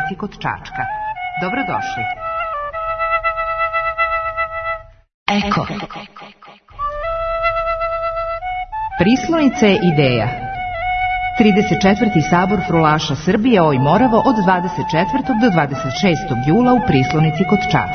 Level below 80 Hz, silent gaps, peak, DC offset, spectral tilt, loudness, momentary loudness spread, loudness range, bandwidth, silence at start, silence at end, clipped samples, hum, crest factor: -38 dBFS; 5.14-5.26 s; 0 dBFS; under 0.1%; -6.5 dB/octave; -17 LUFS; 11 LU; 7 LU; 6.6 kHz; 0 s; 0 s; under 0.1%; none; 16 dB